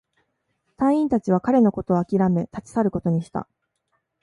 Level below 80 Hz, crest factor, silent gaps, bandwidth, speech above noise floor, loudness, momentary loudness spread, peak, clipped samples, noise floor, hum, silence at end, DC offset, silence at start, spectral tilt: -54 dBFS; 16 dB; none; 11 kHz; 53 dB; -22 LUFS; 8 LU; -6 dBFS; under 0.1%; -73 dBFS; none; 0.8 s; under 0.1%; 0.8 s; -9.5 dB/octave